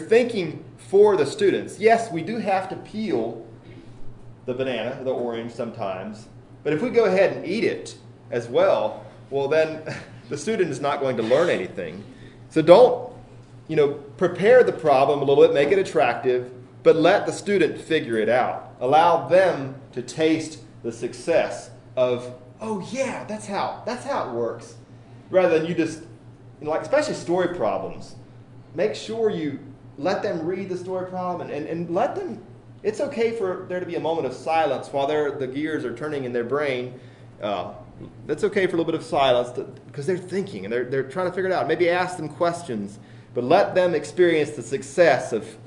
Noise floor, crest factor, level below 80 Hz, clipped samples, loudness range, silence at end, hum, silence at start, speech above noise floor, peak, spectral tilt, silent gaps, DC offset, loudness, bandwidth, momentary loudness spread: -45 dBFS; 22 dB; -58 dBFS; under 0.1%; 8 LU; 0 s; none; 0 s; 23 dB; 0 dBFS; -5.5 dB/octave; none; under 0.1%; -23 LUFS; 11 kHz; 16 LU